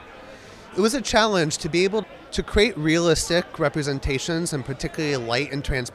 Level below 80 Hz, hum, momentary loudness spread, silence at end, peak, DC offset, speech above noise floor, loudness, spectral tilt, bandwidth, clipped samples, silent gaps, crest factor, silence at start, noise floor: -38 dBFS; none; 11 LU; 0 s; -4 dBFS; under 0.1%; 20 dB; -23 LUFS; -4 dB/octave; 15 kHz; under 0.1%; none; 18 dB; 0 s; -43 dBFS